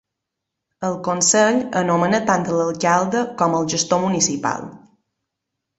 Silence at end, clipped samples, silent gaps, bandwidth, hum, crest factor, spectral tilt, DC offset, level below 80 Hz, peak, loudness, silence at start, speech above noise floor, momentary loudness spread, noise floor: 1 s; under 0.1%; none; 8.4 kHz; none; 18 dB; -3.5 dB/octave; under 0.1%; -60 dBFS; -2 dBFS; -19 LUFS; 0.8 s; 63 dB; 9 LU; -81 dBFS